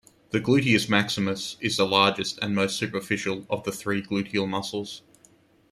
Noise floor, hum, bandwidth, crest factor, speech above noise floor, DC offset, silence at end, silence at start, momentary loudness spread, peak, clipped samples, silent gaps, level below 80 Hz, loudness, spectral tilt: -59 dBFS; none; 15 kHz; 22 dB; 33 dB; under 0.1%; 0.7 s; 0.35 s; 10 LU; -4 dBFS; under 0.1%; none; -62 dBFS; -25 LUFS; -4.5 dB/octave